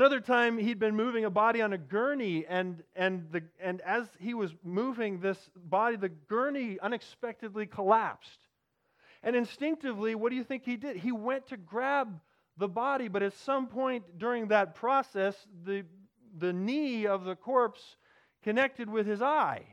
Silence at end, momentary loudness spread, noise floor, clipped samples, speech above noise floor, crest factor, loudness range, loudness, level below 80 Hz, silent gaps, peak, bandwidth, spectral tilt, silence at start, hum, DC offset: 0.1 s; 10 LU; -78 dBFS; under 0.1%; 46 dB; 20 dB; 3 LU; -32 LUFS; -82 dBFS; none; -12 dBFS; 11.5 kHz; -6.5 dB/octave; 0 s; none; under 0.1%